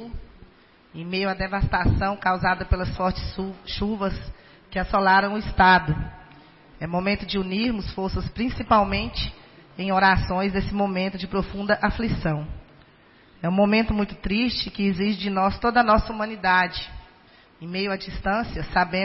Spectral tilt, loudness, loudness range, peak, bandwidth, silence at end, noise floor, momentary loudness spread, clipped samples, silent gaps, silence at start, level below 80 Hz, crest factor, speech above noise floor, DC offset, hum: -9.5 dB/octave; -23 LUFS; 3 LU; -6 dBFS; 5.8 kHz; 0 s; -54 dBFS; 13 LU; under 0.1%; none; 0 s; -36 dBFS; 18 dB; 31 dB; under 0.1%; none